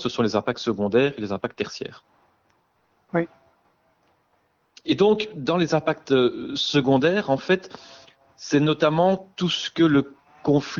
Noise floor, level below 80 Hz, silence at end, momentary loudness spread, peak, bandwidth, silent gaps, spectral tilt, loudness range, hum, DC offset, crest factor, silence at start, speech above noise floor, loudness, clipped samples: -67 dBFS; -60 dBFS; 0 s; 12 LU; -6 dBFS; 7.4 kHz; none; -6 dB/octave; 11 LU; none; under 0.1%; 18 dB; 0 s; 45 dB; -22 LUFS; under 0.1%